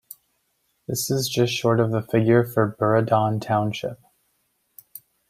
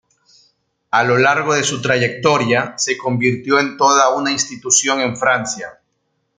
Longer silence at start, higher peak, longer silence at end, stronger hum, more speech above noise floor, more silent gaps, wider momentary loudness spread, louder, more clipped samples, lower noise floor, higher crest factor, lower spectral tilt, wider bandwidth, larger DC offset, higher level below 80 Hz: about the same, 0.9 s vs 0.95 s; second, -4 dBFS vs 0 dBFS; second, 0.3 s vs 0.65 s; neither; about the same, 50 dB vs 53 dB; neither; first, 14 LU vs 6 LU; second, -22 LUFS vs -15 LUFS; neither; about the same, -71 dBFS vs -69 dBFS; about the same, 18 dB vs 16 dB; first, -5.5 dB/octave vs -3 dB/octave; first, 16 kHz vs 10.5 kHz; neither; about the same, -60 dBFS vs -58 dBFS